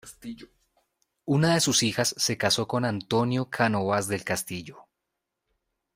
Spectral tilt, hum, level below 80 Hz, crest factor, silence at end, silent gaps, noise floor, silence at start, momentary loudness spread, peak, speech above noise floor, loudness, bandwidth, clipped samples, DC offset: -4 dB/octave; none; -62 dBFS; 22 dB; 1.15 s; none; -84 dBFS; 0.05 s; 20 LU; -6 dBFS; 57 dB; -25 LUFS; 16 kHz; under 0.1%; under 0.1%